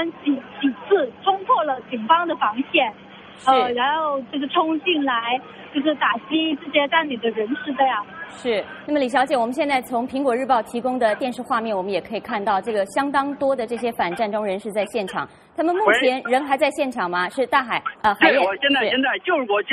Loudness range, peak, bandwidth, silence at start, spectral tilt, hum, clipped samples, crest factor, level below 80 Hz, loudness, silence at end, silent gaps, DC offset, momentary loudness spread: 3 LU; 0 dBFS; 13 kHz; 0 s; -4 dB/octave; none; under 0.1%; 20 dB; -62 dBFS; -21 LUFS; 0 s; none; under 0.1%; 7 LU